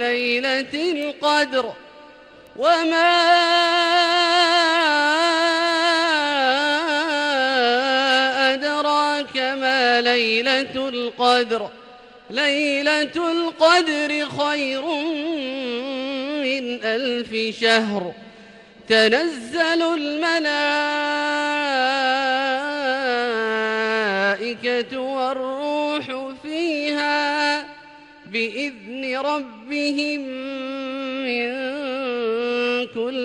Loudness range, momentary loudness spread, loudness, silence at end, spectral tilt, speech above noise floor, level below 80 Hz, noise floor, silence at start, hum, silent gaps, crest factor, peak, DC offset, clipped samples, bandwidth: 7 LU; 10 LU; -20 LUFS; 0 s; -2.5 dB/octave; 25 dB; -66 dBFS; -46 dBFS; 0 s; none; none; 16 dB; -4 dBFS; under 0.1%; under 0.1%; 12.5 kHz